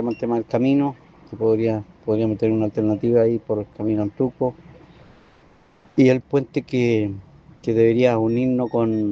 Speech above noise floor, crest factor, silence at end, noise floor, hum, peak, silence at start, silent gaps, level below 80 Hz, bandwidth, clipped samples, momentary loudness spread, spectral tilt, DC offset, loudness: 33 dB; 18 dB; 0 s; -53 dBFS; none; -4 dBFS; 0 s; none; -56 dBFS; 7.2 kHz; under 0.1%; 9 LU; -8.5 dB/octave; under 0.1%; -21 LUFS